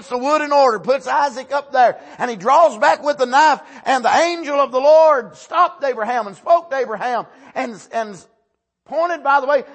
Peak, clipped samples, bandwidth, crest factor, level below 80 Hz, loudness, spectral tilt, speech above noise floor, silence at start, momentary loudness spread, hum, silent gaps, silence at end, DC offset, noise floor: -2 dBFS; under 0.1%; 8.6 kHz; 14 dB; -70 dBFS; -17 LUFS; -3 dB/octave; 53 dB; 0 s; 12 LU; none; none; 0.1 s; under 0.1%; -69 dBFS